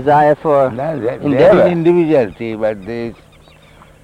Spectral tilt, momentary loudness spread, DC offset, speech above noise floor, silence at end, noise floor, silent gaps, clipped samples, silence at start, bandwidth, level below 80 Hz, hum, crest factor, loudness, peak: -8.5 dB/octave; 14 LU; under 0.1%; 31 dB; 0.9 s; -44 dBFS; none; under 0.1%; 0 s; 9.8 kHz; -46 dBFS; none; 12 dB; -13 LUFS; -2 dBFS